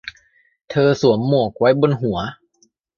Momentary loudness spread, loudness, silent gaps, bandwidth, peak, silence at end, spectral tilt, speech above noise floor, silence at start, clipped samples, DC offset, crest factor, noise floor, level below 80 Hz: 11 LU; -17 LUFS; none; 7.2 kHz; -2 dBFS; 0.65 s; -7 dB/octave; 45 dB; 0.05 s; under 0.1%; under 0.1%; 16 dB; -61 dBFS; -50 dBFS